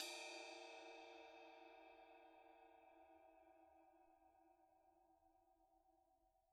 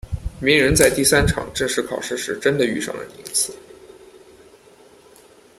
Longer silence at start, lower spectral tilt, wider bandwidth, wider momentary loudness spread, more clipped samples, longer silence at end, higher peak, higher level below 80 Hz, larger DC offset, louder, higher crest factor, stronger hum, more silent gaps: about the same, 0 s vs 0.05 s; second, 0 dB/octave vs -3.5 dB/octave; second, 11.5 kHz vs 16 kHz; first, 16 LU vs 12 LU; neither; second, 0 s vs 1.7 s; second, -34 dBFS vs 0 dBFS; second, under -90 dBFS vs -36 dBFS; neither; second, -60 LUFS vs -19 LUFS; first, 28 dB vs 22 dB; neither; neither